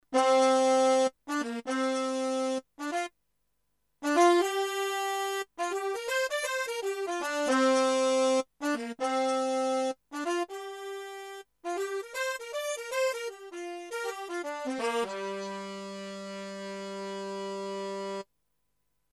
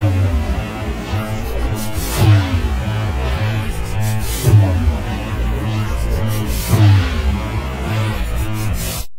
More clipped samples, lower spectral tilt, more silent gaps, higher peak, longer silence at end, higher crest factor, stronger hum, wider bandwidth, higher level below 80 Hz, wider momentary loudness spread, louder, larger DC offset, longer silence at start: neither; second, -2.5 dB/octave vs -6 dB/octave; neither; second, -10 dBFS vs 0 dBFS; first, 0.9 s vs 0 s; about the same, 20 dB vs 16 dB; neither; second, 13.5 kHz vs 16 kHz; second, -78 dBFS vs -22 dBFS; first, 16 LU vs 9 LU; second, -30 LUFS vs -18 LUFS; neither; about the same, 0.1 s vs 0 s